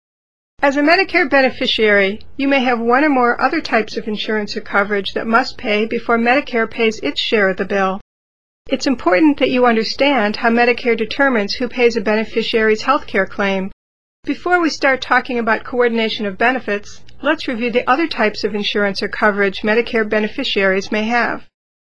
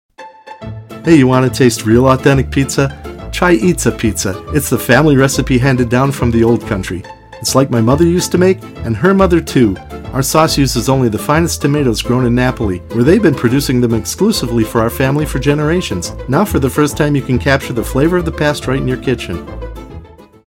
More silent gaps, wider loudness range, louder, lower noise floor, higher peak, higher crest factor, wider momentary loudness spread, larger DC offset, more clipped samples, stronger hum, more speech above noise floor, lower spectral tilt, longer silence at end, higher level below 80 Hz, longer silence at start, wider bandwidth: first, 8.01-8.65 s, 13.73-14.23 s vs none; about the same, 3 LU vs 2 LU; second, -16 LUFS vs -13 LUFS; first, under -90 dBFS vs -35 dBFS; about the same, 0 dBFS vs 0 dBFS; about the same, 16 dB vs 12 dB; second, 7 LU vs 11 LU; first, 3% vs under 0.1%; neither; neither; first, over 74 dB vs 22 dB; about the same, -4.5 dB/octave vs -5.5 dB/octave; about the same, 0.35 s vs 0.25 s; second, -48 dBFS vs -30 dBFS; first, 0.55 s vs 0.2 s; second, 11 kHz vs 17 kHz